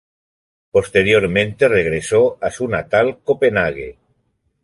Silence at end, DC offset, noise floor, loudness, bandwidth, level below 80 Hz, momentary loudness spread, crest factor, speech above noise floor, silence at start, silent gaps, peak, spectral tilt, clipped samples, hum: 0.7 s; under 0.1%; -66 dBFS; -16 LUFS; 11.5 kHz; -44 dBFS; 8 LU; 16 dB; 50 dB; 0.75 s; none; -2 dBFS; -5 dB/octave; under 0.1%; none